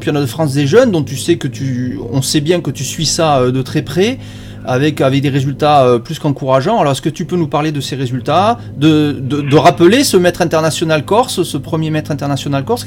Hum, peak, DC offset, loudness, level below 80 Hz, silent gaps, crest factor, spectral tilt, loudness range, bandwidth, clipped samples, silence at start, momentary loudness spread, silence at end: none; 0 dBFS; under 0.1%; -13 LUFS; -42 dBFS; none; 12 dB; -5.5 dB/octave; 3 LU; 17 kHz; under 0.1%; 0 s; 9 LU; 0 s